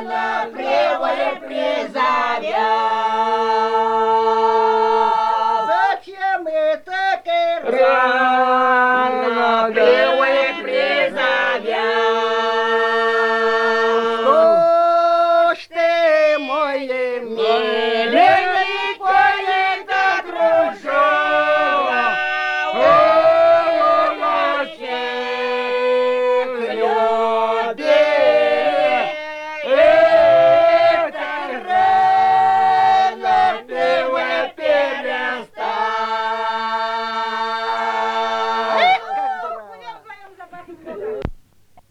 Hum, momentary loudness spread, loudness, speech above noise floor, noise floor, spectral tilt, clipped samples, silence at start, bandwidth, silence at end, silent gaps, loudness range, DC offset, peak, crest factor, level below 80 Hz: none; 9 LU; -16 LUFS; 32 dB; -50 dBFS; -3.5 dB/octave; under 0.1%; 0 s; 10 kHz; 0.55 s; none; 5 LU; under 0.1%; -2 dBFS; 14 dB; -54 dBFS